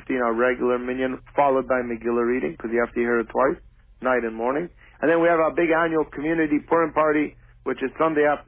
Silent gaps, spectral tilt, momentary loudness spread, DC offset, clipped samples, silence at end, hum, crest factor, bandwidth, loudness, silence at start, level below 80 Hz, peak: none; -10 dB/octave; 8 LU; under 0.1%; under 0.1%; 0.05 s; none; 16 dB; 3.7 kHz; -23 LUFS; 0 s; -52 dBFS; -8 dBFS